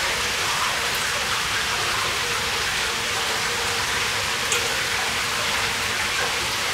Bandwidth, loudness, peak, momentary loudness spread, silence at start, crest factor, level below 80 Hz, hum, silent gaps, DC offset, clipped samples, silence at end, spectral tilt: 16 kHz; -22 LUFS; -6 dBFS; 1 LU; 0 s; 18 dB; -46 dBFS; none; none; under 0.1%; under 0.1%; 0 s; -0.5 dB/octave